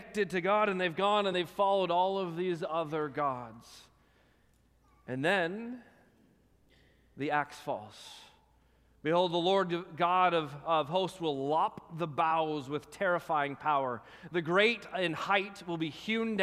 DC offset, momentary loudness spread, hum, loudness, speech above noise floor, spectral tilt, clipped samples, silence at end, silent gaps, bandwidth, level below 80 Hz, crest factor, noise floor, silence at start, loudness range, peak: under 0.1%; 12 LU; none; -31 LUFS; 36 dB; -5.5 dB/octave; under 0.1%; 0 s; none; 15 kHz; -70 dBFS; 20 dB; -67 dBFS; 0 s; 7 LU; -14 dBFS